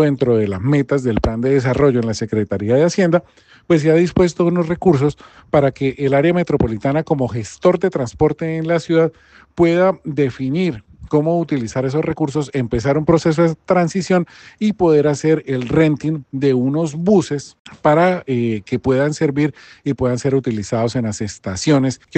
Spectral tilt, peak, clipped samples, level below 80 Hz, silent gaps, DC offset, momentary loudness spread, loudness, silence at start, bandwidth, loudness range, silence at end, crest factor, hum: -7 dB/octave; 0 dBFS; under 0.1%; -42 dBFS; 17.59-17.65 s; under 0.1%; 7 LU; -17 LUFS; 0 s; 8.8 kHz; 2 LU; 0 s; 16 dB; none